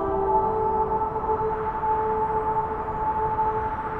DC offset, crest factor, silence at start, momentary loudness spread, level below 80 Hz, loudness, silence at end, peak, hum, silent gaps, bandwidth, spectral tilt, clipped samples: under 0.1%; 14 dB; 0 s; 4 LU; -40 dBFS; -25 LUFS; 0 s; -12 dBFS; none; none; 4.2 kHz; -9 dB/octave; under 0.1%